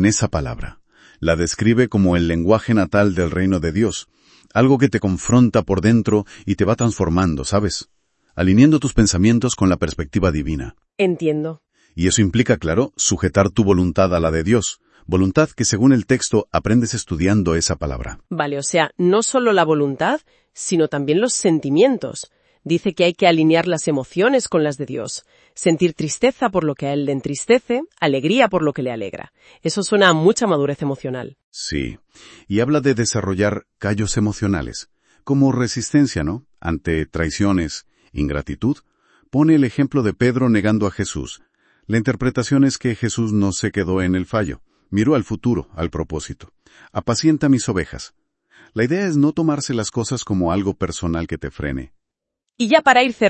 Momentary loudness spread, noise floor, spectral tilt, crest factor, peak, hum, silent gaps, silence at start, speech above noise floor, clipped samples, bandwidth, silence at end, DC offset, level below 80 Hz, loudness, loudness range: 12 LU; -80 dBFS; -5.5 dB/octave; 18 dB; 0 dBFS; none; 31.44-31.52 s; 0 s; 62 dB; under 0.1%; 8.8 kHz; 0 s; under 0.1%; -40 dBFS; -18 LUFS; 4 LU